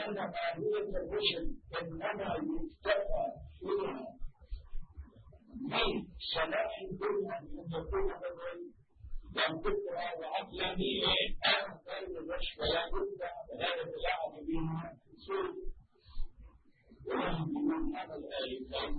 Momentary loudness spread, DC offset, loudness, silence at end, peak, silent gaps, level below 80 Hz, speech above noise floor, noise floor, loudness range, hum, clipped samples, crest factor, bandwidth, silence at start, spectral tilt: 18 LU; under 0.1%; -36 LUFS; 0 s; -16 dBFS; none; -46 dBFS; 26 dB; -62 dBFS; 6 LU; none; under 0.1%; 20 dB; 4.6 kHz; 0 s; -2.5 dB/octave